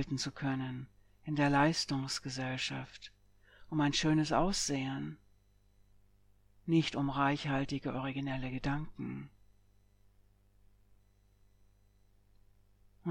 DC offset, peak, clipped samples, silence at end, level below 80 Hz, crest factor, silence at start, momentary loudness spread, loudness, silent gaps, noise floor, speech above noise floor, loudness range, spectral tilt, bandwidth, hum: under 0.1%; -16 dBFS; under 0.1%; 0 s; -56 dBFS; 20 dB; 0 s; 17 LU; -34 LUFS; none; -67 dBFS; 33 dB; 10 LU; -5 dB/octave; 13 kHz; 50 Hz at -60 dBFS